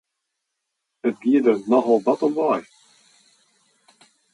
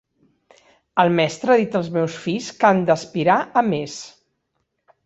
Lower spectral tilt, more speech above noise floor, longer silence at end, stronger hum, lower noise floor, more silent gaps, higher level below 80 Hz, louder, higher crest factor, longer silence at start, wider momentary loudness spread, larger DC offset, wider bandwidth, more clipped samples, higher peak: first, -7 dB/octave vs -5.5 dB/octave; first, 60 dB vs 54 dB; first, 1.7 s vs 0.95 s; neither; first, -79 dBFS vs -73 dBFS; neither; second, -76 dBFS vs -62 dBFS; about the same, -20 LUFS vs -19 LUFS; about the same, 18 dB vs 18 dB; about the same, 1.05 s vs 0.95 s; about the same, 9 LU vs 9 LU; neither; first, 11 kHz vs 8.2 kHz; neither; about the same, -4 dBFS vs -2 dBFS